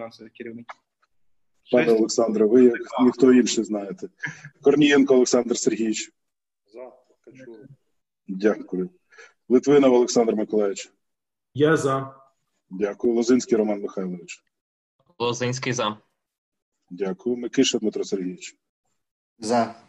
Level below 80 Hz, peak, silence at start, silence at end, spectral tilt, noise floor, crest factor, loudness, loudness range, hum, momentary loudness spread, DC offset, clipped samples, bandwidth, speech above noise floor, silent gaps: -66 dBFS; -4 dBFS; 0 s; 0.15 s; -4.5 dB/octave; -86 dBFS; 18 dB; -21 LUFS; 10 LU; none; 21 LU; under 0.1%; under 0.1%; 10.5 kHz; 64 dB; 14.61-14.99 s, 16.38-16.52 s, 16.62-16.72 s, 18.69-18.84 s, 19.11-19.36 s